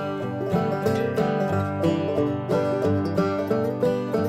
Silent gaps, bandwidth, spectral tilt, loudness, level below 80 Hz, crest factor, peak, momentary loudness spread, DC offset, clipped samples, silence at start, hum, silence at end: none; 16 kHz; -8 dB/octave; -24 LUFS; -58 dBFS; 14 dB; -8 dBFS; 2 LU; under 0.1%; under 0.1%; 0 s; none; 0 s